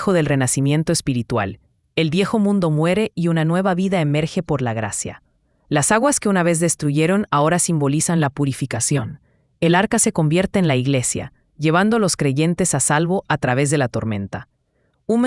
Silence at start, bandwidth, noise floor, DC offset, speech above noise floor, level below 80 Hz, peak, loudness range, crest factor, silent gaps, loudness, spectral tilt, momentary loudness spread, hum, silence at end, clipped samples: 0 s; 12 kHz; -65 dBFS; under 0.1%; 47 dB; -50 dBFS; 0 dBFS; 2 LU; 18 dB; none; -18 LUFS; -5 dB/octave; 7 LU; none; 0 s; under 0.1%